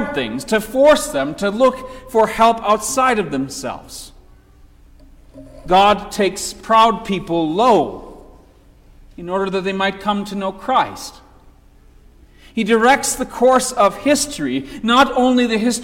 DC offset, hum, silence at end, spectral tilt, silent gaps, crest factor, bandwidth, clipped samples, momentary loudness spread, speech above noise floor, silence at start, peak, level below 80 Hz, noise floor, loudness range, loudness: under 0.1%; none; 0 s; -3.5 dB/octave; none; 16 dB; 17 kHz; under 0.1%; 13 LU; 31 dB; 0 s; -2 dBFS; -44 dBFS; -47 dBFS; 6 LU; -16 LUFS